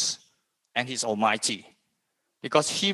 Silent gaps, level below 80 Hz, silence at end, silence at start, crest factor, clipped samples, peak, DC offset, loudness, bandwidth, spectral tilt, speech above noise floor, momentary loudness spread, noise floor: none; -76 dBFS; 0 s; 0 s; 24 dB; under 0.1%; -4 dBFS; under 0.1%; -26 LUFS; 13 kHz; -2 dB/octave; 52 dB; 13 LU; -78 dBFS